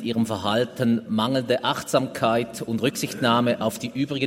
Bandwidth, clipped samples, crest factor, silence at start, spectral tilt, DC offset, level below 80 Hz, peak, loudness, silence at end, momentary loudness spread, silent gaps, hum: 16 kHz; under 0.1%; 18 dB; 0 s; -5 dB/octave; under 0.1%; -64 dBFS; -6 dBFS; -24 LUFS; 0 s; 5 LU; none; none